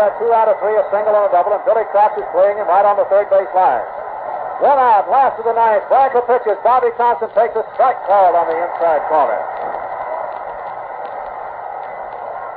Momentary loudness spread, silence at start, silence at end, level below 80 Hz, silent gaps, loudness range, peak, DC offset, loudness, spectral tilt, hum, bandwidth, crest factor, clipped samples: 14 LU; 0 s; 0 s; -58 dBFS; none; 6 LU; -2 dBFS; under 0.1%; -15 LUFS; -8 dB/octave; none; 4.6 kHz; 12 dB; under 0.1%